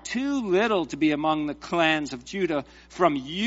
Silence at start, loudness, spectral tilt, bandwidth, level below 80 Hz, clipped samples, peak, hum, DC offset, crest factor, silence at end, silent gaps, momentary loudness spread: 0.05 s; -25 LUFS; -3 dB/octave; 8 kHz; -56 dBFS; under 0.1%; -6 dBFS; none; under 0.1%; 20 dB; 0 s; none; 7 LU